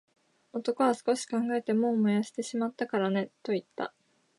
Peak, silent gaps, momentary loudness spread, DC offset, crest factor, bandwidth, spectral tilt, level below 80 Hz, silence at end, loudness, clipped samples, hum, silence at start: -12 dBFS; none; 10 LU; under 0.1%; 18 dB; 11.5 kHz; -5.5 dB/octave; -82 dBFS; 0.5 s; -30 LUFS; under 0.1%; none; 0.55 s